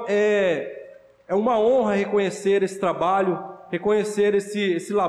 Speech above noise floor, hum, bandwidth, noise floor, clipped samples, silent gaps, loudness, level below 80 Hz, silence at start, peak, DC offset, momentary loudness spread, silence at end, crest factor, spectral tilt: 24 dB; none; 12 kHz; -45 dBFS; under 0.1%; none; -22 LUFS; -64 dBFS; 0 s; -12 dBFS; under 0.1%; 8 LU; 0 s; 10 dB; -5.5 dB/octave